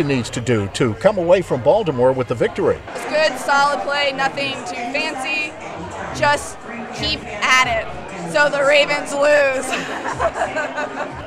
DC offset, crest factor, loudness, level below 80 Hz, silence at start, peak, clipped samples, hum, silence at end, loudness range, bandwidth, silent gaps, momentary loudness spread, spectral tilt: under 0.1%; 18 dB; -18 LUFS; -44 dBFS; 0 s; 0 dBFS; under 0.1%; none; 0 s; 4 LU; 14 kHz; none; 11 LU; -4 dB/octave